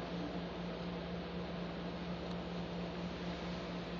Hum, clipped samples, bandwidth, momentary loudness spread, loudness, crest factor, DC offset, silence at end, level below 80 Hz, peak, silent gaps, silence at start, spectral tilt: none; under 0.1%; 7.2 kHz; 1 LU; -43 LUFS; 12 dB; under 0.1%; 0 s; -56 dBFS; -30 dBFS; none; 0 s; -5 dB/octave